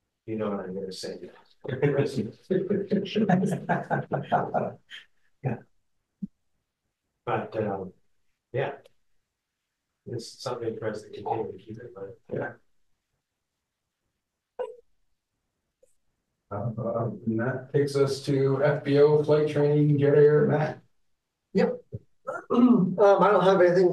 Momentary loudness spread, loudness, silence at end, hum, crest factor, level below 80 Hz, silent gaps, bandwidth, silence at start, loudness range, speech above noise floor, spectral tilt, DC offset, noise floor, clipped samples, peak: 20 LU; -25 LUFS; 0 s; none; 16 dB; -68 dBFS; none; 12 kHz; 0.25 s; 18 LU; 58 dB; -7.5 dB/octave; under 0.1%; -83 dBFS; under 0.1%; -10 dBFS